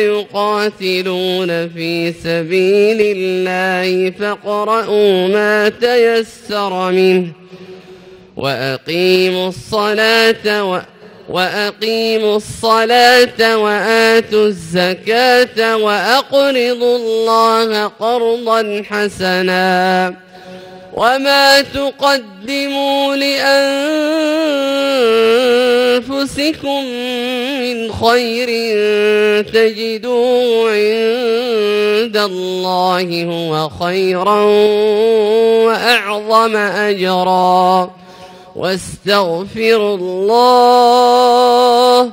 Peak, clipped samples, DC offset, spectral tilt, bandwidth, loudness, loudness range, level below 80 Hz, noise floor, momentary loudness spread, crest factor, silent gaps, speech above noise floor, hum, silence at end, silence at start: 0 dBFS; under 0.1%; under 0.1%; -4 dB/octave; 16.5 kHz; -13 LUFS; 4 LU; -52 dBFS; -38 dBFS; 9 LU; 14 dB; none; 25 dB; none; 0 s; 0 s